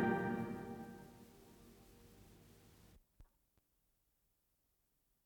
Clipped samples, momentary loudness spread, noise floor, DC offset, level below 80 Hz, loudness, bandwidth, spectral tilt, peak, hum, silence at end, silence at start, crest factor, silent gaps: under 0.1%; 24 LU; -82 dBFS; under 0.1%; -72 dBFS; -44 LUFS; over 20 kHz; -7.5 dB/octave; -26 dBFS; none; 2 s; 0 s; 22 dB; none